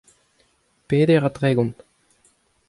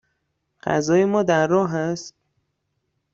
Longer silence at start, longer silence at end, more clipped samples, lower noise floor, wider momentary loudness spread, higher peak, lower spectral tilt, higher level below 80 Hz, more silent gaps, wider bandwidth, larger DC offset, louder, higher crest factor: first, 0.9 s vs 0.65 s; about the same, 0.95 s vs 1.05 s; neither; second, -63 dBFS vs -74 dBFS; second, 7 LU vs 13 LU; about the same, -6 dBFS vs -4 dBFS; first, -8 dB/octave vs -6 dB/octave; about the same, -58 dBFS vs -62 dBFS; neither; first, 11.5 kHz vs 7.8 kHz; neither; about the same, -20 LUFS vs -20 LUFS; about the same, 18 dB vs 18 dB